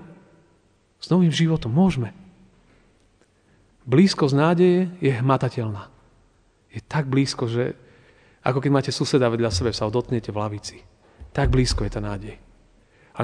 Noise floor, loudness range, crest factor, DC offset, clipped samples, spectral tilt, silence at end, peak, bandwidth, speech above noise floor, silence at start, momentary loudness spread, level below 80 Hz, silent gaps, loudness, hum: -61 dBFS; 5 LU; 20 dB; under 0.1%; under 0.1%; -6.5 dB/octave; 0 s; -4 dBFS; 10 kHz; 40 dB; 0 s; 16 LU; -40 dBFS; none; -22 LUFS; none